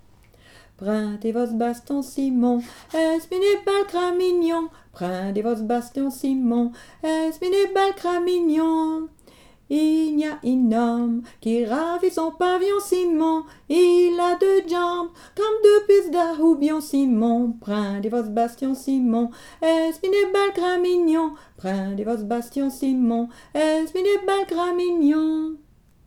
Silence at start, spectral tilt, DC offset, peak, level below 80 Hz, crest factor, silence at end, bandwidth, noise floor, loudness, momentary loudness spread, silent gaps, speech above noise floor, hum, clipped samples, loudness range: 0.8 s; -5.5 dB/octave; under 0.1%; -4 dBFS; -58 dBFS; 18 dB; 0.5 s; 16.5 kHz; -52 dBFS; -22 LUFS; 9 LU; none; 31 dB; none; under 0.1%; 4 LU